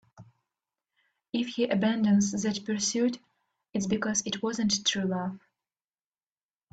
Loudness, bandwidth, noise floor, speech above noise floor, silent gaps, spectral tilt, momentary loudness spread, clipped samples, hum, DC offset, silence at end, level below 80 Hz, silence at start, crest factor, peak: -28 LUFS; 9 kHz; under -90 dBFS; over 62 dB; none; -4 dB/octave; 10 LU; under 0.1%; none; under 0.1%; 1.35 s; -68 dBFS; 0.2 s; 18 dB; -12 dBFS